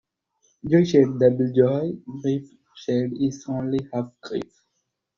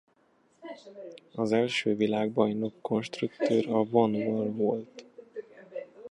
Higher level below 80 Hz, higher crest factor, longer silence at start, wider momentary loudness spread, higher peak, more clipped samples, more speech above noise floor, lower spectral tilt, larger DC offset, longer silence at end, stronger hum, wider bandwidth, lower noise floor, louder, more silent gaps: first, -60 dBFS vs -74 dBFS; about the same, 20 dB vs 20 dB; about the same, 0.65 s vs 0.65 s; second, 14 LU vs 20 LU; first, -4 dBFS vs -10 dBFS; neither; first, 55 dB vs 38 dB; first, -8 dB/octave vs -6.5 dB/octave; neither; first, 0.75 s vs 0.05 s; neither; second, 7.4 kHz vs 11 kHz; first, -77 dBFS vs -67 dBFS; first, -23 LUFS vs -28 LUFS; neither